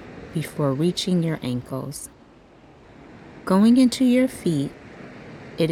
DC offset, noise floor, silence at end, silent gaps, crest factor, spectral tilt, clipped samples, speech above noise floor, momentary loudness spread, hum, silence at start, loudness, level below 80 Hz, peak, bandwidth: under 0.1%; -50 dBFS; 0 s; none; 14 dB; -6 dB/octave; under 0.1%; 29 dB; 24 LU; none; 0 s; -22 LUFS; -56 dBFS; -8 dBFS; 15 kHz